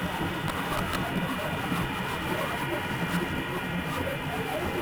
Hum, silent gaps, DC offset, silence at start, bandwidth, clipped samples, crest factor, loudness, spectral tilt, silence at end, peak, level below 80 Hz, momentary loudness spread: none; none; under 0.1%; 0 s; over 20 kHz; under 0.1%; 14 dB; -30 LUFS; -5 dB/octave; 0 s; -16 dBFS; -48 dBFS; 2 LU